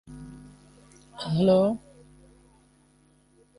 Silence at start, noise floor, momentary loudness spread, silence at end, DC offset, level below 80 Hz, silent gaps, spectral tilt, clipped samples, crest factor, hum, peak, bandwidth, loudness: 0.1 s; -61 dBFS; 27 LU; 1.8 s; under 0.1%; -58 dBFS; none; -8 dB/octave; under 0.1%; 18 dB; 50 Hz at -50 dBFS; -10 dBFS; 11.5 kHz; -24 LUFS